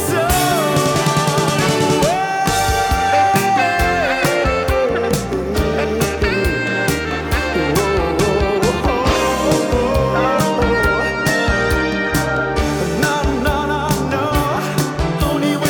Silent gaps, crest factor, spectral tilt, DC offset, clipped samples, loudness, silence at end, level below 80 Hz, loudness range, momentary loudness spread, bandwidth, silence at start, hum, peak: none; 10 dB; -4.5 dB/octave; under 0.1%; under 0.1%; -16 LUFS; 0 s; -28 dBFS; 2 LU; 4 LU; over 20 kHz; 0 s; none; -6 dBFS